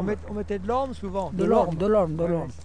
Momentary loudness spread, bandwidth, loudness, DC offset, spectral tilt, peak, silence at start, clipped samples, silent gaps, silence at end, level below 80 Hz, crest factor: 9 LU; 10 kHz; -25 LUFS; 0.8%; -8 dB/octave; -8 dBFS; 0 s; under 0.1%; none; 0 s; -42 dBFS; 16 dB